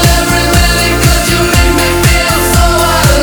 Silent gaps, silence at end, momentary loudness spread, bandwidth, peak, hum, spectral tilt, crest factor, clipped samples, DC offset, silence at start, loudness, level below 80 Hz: none; 0 s; 1 LU; over 20 kHz; 0 dBFS; none; -4 dB/octave; 8 dB; 0.3%; 0.3%; 0 s; -8 LUFS; -14 dBFS